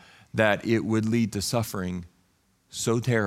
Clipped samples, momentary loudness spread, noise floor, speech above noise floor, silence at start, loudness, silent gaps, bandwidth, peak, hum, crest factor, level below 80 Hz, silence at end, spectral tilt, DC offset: under 0.1%; 10 LU; -67 dBFS; 42 dB; 0.35 s; -26 LUFS; none; 16.5 kHz; -6 dBFS; none; 20 dB; -58 dBFS; 0 s; -5 dB/octave; under 0.1%